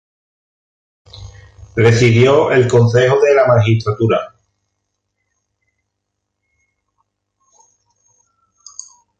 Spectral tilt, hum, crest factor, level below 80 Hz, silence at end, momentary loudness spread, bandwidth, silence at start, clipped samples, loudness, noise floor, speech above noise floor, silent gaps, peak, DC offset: -6.5 dB/octave; 50 Hz at -45 dBFS; 16 dB; -46 dBFS; 4.95 s; 23 LU; 8.6 kHz; 1.2 s; under 0.1%; -12 LUFS; -75 dBFS; 64 dB; none; 0 dBFS; under 0.1%